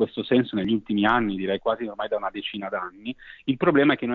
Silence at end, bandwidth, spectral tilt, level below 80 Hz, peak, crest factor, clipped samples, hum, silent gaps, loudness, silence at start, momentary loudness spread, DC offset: 0 s; 4.7 kHz; -8.5 dB/octave; -56 dBFS; -6 dBFS; 18 dB; under 0.1%; none; none; -24 LUFS; 0 s; 11 LU; under 0.1%